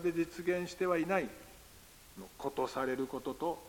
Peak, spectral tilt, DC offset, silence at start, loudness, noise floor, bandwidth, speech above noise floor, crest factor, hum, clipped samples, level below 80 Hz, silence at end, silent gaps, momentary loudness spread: -18 dBFS; -5.5 dB/octave; under 0.1%; 0 s; -36 LUFS; -57 dBFS; 17 kHz; 22 dB; 18 dB; none; under 0.1%; -64 dBFS; 0 s; none; 21 LU